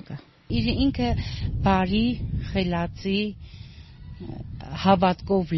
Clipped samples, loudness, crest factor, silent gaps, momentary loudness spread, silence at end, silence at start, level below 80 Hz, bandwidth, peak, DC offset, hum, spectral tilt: under 0.1%; -24 LUFS; 20 dB; none; 21 LU; 0 s; 0.1 s; -36 dBFS; 6 kHz; -4 dBFS; under 0.1%; none; -5.5 dB/octave